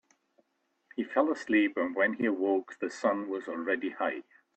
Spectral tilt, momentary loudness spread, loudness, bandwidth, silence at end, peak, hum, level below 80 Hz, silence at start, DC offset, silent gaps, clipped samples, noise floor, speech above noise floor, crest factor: -5.5 dB/octave; 10 LU; -30 LUFS; 8.6 kHz; 0.35 s; -14 dBFS; none; -76 dBFS; 0.95 s; under 0.1%; none; under 0.1%; -76 dBFS; 46 dB; 18 dB